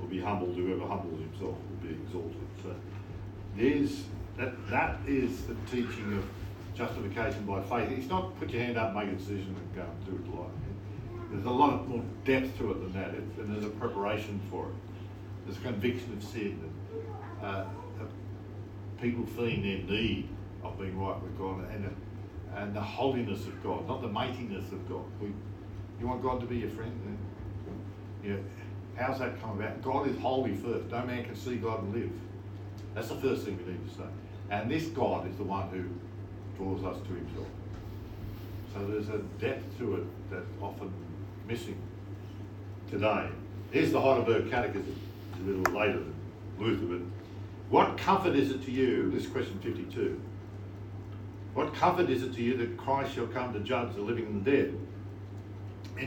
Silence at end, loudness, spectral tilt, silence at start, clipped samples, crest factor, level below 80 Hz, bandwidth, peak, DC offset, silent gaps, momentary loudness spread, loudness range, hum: 0 s; -34 LUFS; -7 dB/octave; 0 s; under 0.1%; 24 dB; -52 dBFS; 17.5 kHz; -8 dBFS; under 0.1%; none; 15 LU; 7 LU; none